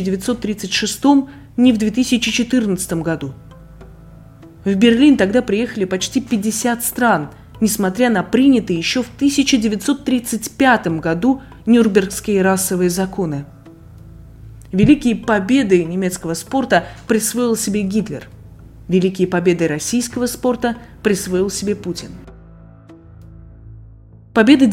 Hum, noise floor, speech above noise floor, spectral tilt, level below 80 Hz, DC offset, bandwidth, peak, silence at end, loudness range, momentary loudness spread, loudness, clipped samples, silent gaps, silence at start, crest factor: none; -42 dBFS; 26 dB; -4.5 dB/octave; -44 dBFS; under 0.1%; 16.5 kHz; 0 dBFS; 0 s; 4 LU; 9 LU; -16 LUFS; under 0.1%; none; 0 s; 16 dB